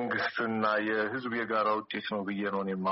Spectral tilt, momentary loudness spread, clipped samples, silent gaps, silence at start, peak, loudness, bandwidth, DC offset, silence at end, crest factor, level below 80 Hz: -3 dB/octave; 5 LU; under 0.1%; none; 0 s; -16 dBFS; -31 LUFS; 5.8 kHz; under 0.1%; 0 s; 16 dB; -74 dBFS